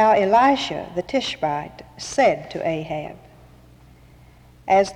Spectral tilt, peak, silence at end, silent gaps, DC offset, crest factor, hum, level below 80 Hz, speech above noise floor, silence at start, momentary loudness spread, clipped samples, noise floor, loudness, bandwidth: -4.5 dB/octave; -6 dBFS; 0 s; none; under 0.1%; 14 dB; none; -52 dBFS; 29 dB; 0 s; 18 LU; under 0.1%; -49 dBFS; -21 LUFS; 12 kHz